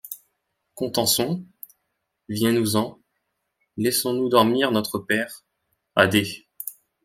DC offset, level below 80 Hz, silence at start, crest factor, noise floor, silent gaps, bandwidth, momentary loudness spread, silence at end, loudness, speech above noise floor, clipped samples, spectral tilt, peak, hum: under 0.1%; -62 dBFS; 0.05 s; 24 dB; -77 dBFS; none; 16.5 kHz; 19 LU; 0.35 s; -22 LUFS; 56 dB; under 0.1%; -4 dB/octave; -2 dBFS; none